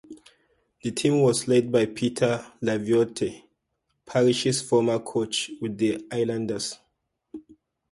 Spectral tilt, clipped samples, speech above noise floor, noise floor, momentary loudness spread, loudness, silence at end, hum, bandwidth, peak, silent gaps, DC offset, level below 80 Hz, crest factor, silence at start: -5 dB/octave; under 0.1%; 53 dB; -77 dBFS; 12 LU; -25 LUFS; 0.5 s; none; 11.5 kHz; -8 dBFS; none; under 0.1%; -62 dBFS; 18 dB; 0.1 s